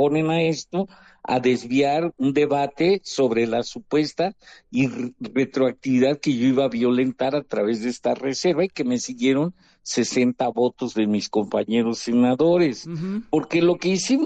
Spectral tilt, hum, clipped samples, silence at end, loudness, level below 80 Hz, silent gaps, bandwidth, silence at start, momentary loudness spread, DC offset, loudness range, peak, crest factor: -5.5 dB/octave; none; under 0.1%; 0 s; -22 LUFS; -62 dBFS; none; 9 kHz; 0 s; 7 LU; under 0.1%; 2 LU; -8 dBFS; 14 dB